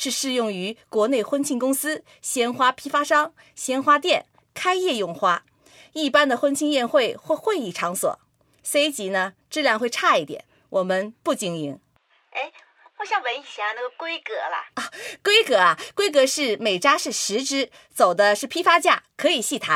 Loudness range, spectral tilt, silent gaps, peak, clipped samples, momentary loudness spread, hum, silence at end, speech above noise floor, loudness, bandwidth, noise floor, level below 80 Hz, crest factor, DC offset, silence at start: 8 LU; -2 dB/octave; none; -2 dBFS; under 0.1%; 12 LU; none; 0 s; 37 dB; -22 LUFS; 16.5 kHz; -60 dBFS; -74 dBFS; 20 dB; under 0.1%; 0 s